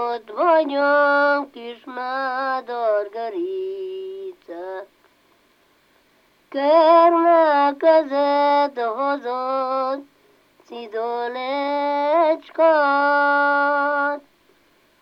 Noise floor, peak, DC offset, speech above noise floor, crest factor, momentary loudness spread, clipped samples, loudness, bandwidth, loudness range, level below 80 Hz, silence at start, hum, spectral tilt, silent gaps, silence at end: -59 dBFS; -4 dBFS; under 0.1%; 41 dB; 16 dB; 17 LU; under 0.1%; -19 LUFS; 5.8 kHz; 11 LU; -74 dBFS; 0 s; none; -4.5 dB/octave; none; 0.8 s